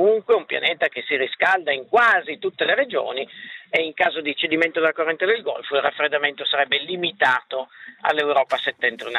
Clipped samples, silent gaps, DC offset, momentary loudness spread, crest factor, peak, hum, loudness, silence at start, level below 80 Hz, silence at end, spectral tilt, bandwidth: under 0.1%; none; under 0.1%; 7 LU; 20 dB; -2 dBFS; none; -21 LUFS; 0 s; -72 dBFS; 0 s; -4 dB/octave; 10.5 kHz